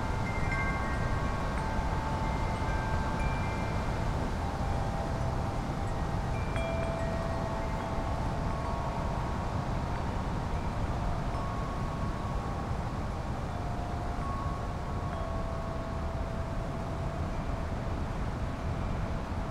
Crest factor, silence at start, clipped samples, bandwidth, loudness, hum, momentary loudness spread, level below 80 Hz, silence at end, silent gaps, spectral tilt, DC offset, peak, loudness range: 14 dB; 0 s; under 0.1%; 13.5 kHz; -34 LUFS; none; 4 LU; -36 dBFS; 0 s; none; -6.5 dB/octave; under 0.1%; -18 dBFS; 3 LU